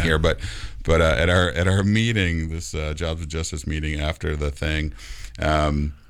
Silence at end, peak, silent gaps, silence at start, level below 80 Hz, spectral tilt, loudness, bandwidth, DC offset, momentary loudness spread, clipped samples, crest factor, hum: 0.1 s; -6 dBFS; none; 0 s; -30 dBFS; -5.5 dB/octave; -23 LUFS; 12.5 kHz; under 0.1%; 10 LU; under 0.1%; 16 dB; none